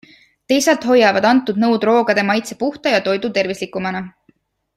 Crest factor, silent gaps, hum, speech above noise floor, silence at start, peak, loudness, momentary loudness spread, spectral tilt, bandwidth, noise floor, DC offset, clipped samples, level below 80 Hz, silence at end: 16 dB; none; none; 43 dB; 0.5 s; -2 dBFS; -16 LUFS; 11 LU; -4 dB/octave; 14.5 kHz; -58 dBFS; under 0.1%; under 0.1%; -60 dBFS; 0.65 s